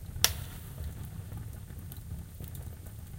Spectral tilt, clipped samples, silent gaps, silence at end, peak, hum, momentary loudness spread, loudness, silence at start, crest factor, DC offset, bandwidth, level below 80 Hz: -2 dB/octave; under 0.1%; none; 0 s; 0 dBFS; none; 16 LU; -37 LUFS; 0 s; 38 dB; under 0.1%; 17 kHz; -46 dBFS